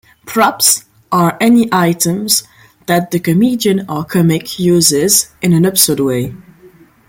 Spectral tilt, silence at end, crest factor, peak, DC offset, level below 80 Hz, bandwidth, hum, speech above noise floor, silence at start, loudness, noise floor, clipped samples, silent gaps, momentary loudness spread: -4 dB/octave; 0.7 s; 14 dB; 0 dBFS; under 0.1%; -48 dBFS; 17 kHz; none; 31 dB; 0.25 s; -12 LUFS; -43 dBFS; under 0.1%; none; 8 LU